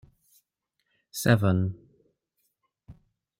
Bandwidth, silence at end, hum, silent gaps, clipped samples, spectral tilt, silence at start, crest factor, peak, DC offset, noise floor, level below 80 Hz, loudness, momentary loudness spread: 16.5 kHz; 0.45 s; none; none; under 0.1%; -6 dB/octave; 1.15 s; 24 dB; -6 dBFS; under 0.1%; -80 dBFS; -62 dBFS; -25 LUFS; 18 LU